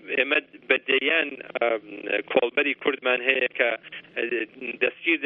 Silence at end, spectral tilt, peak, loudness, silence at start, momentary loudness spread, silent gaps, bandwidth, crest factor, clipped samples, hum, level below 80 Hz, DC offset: 0 s; -6.5 dB/octave; -4 dBFS; -24 LUFS; 0.05 s; 9 LU; none; 4.7 kHz; 20 dB; under 0.1%; none; -78 dBFS; under 0.1%